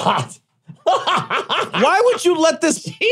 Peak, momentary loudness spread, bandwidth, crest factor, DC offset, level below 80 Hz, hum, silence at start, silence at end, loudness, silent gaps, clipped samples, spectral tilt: -2 dBFS; 7 LU; 15 kHz; 16 dB; under 0.1%; -70 dBFS; none; 0 s; 0 s; -17 LUFS; none; under 0.1%; -3.5 dB/octave